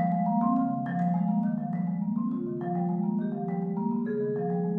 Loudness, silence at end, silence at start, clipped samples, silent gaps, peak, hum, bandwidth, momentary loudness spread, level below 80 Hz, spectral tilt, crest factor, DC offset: -29 LUFS; 0 s; 0 s; under 0.1%; none; -14 dBFS; none; 2.2 kHz; 5 LU; -70 dBFS; -12.5 dB/octave; 14 dB; under 0.1%